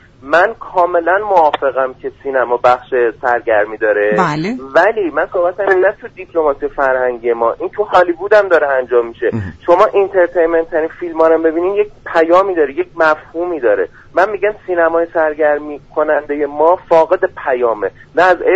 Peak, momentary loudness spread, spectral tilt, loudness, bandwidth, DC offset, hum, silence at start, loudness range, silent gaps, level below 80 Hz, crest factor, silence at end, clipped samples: 0 dBFS; 7 LU; -6.5 dB/octave; -14 LUFS; 8 kHz; under 0.1%; none; 0.25 s; 2 LU; none; -46 dBFS; 14 dB; 0 s; under 0.1%